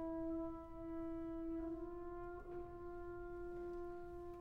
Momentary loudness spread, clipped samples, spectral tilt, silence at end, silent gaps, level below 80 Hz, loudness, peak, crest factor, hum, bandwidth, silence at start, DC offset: 6 LU; under 0.1%; -9 dB/octave; 0 s; none; -58 dBFS; -49 LUFS; -34 dBFS; 12 dB; none; 4.4 kHz; 0 s; under 0.1%